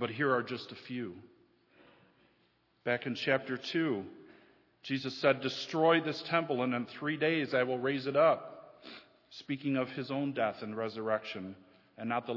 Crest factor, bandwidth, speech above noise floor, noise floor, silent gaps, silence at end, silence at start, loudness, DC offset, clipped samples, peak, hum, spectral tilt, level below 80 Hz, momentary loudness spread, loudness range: 22 dB; 6 kHz; 39 dB; -72 dBFS; none; 0 s; 0 s; -33 LUFS; under 0.1%; under 0.1%; -12 dBFS; none; -6 dB/octave; -82 dBFS; 20 LU; 6 LU